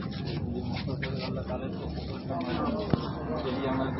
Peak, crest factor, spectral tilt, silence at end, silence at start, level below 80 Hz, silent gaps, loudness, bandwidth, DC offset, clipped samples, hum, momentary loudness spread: -8 dBFS; 24 dB; -10 dB/octave; 0 s; 0 s; -44 dBFS; none; -33 LUFS; 6 kHz; under 0.1%; under 0.1%; none; 5 LU